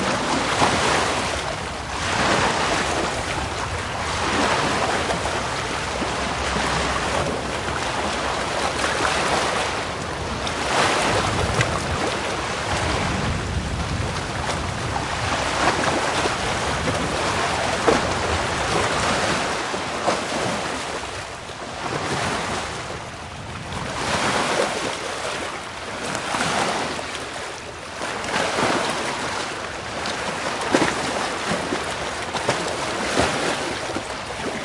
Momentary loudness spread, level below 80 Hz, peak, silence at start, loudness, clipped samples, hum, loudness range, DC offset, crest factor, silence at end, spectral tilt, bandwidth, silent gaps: 8 LU; -40 dBFS; 0 dBFS; 0 s; -23 LUFS; under 0.1%; none; 4 LU; under 0.1%; 22 dB; 0 s; -3.5 dB/octave; 11.5 kHz; none